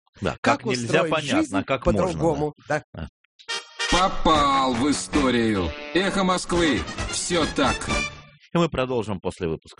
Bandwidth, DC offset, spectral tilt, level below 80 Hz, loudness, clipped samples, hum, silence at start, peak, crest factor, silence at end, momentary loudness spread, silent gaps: 10.5 kHz; under 0.1%; -4.5 dB/octave; -38 dBFS; -23 LUFS; under 0.1%; none; 0.2 s; -6 dBFS; 16 dB; 0.1 s; 10 LU; 0.38-0.43 s, 2.84-2.93 s, 3.09-3.39 s